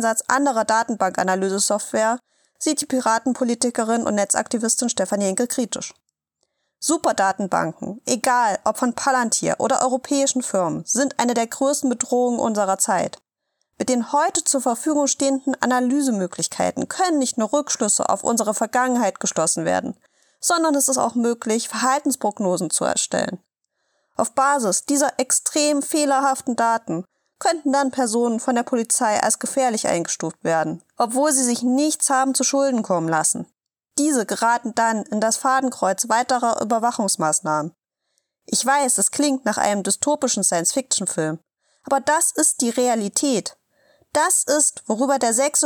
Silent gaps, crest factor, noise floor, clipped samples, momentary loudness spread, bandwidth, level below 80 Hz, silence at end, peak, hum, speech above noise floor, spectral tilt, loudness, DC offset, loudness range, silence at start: none; 20 dB; -74 dBFS; under 0.1%; 6 LU; 19 kHz; -70 dBFS; 0 s; -2 dBFS; none; 54 dB; -2.5 dB/octave; -20 LUFS; under 0.1%; 2 LU; 0 s